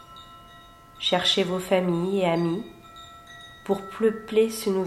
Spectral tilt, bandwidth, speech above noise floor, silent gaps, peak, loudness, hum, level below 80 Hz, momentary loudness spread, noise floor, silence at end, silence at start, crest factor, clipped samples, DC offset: -5 dB/octave; 15.5 kHz; 25 dB; none; -8 dBFS; -24 LUFS; none; -58 dBFS; 22 LU; -49 dBFS; 0 s; 0 s; 18 dB; under 0.1%; under 0.1%